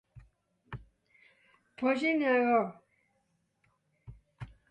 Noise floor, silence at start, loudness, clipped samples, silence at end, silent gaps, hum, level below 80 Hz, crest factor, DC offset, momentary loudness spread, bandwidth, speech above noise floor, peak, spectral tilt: -76 dBFS; 0.15 s; -29 LUFS; under 0.1%; 0.25 s; none; none; -64 dBFS; 18 dB; under 0.1%; 23 LU; 9 kHz; 48 dB; -16 dBFS; -6.5 dB/octave